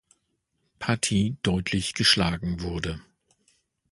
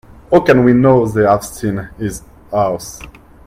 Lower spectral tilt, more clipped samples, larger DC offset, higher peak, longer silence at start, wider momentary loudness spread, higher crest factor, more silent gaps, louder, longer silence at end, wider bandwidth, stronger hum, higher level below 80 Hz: second, -4 dB/octave vs -7 dB/octave; neither; neither; second, -6 dBFS vs 0 dBFS; first, 0.8 s vs 0.3 s; second, 13 LU vs 16 LU; first, 22 dB vs 14 dB; neither; second, -25 LUFS vs -14 LUFS; first, 0.9 s vs 0.35 s; second, 11.5 kHz vs 16 kHz; neither; about the same, -44 dBFS vs -40 dBFS